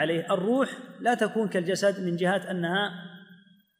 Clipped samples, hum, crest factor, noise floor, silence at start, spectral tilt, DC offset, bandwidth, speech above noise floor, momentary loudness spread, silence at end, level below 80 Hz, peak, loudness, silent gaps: under 0.1%; none; 16 dB; -56 dBFS; 0 s; -5.5 dB/octave; under 0.1%; 15.5 kHz; 29 dB; 6 LU; 0.45 s; -78 dBFS; -12 dBFS; -27 LUFS; none